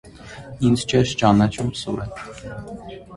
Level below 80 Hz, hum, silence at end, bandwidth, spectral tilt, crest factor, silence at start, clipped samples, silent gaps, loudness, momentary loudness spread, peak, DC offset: -44 dBFS; none; 0 s; 11.5 kHz; -6 dB/octave; 20 dB; 0.05 s; under 0.1%; none; -20 LUFS; 20 LU; -2 dBFS; under 0.1%